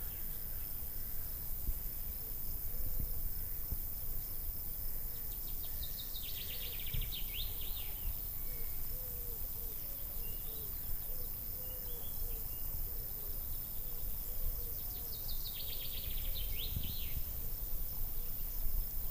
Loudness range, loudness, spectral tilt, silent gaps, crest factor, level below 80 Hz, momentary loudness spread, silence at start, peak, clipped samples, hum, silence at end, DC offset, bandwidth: 1 LU; -40 LUFS; -3 dB/octave; none; 16 dB; -42 dBFS; 2 LU; 0 s; -22 dBFS; under 0.1%; none; 0 s; under 0.1%; 16 kHz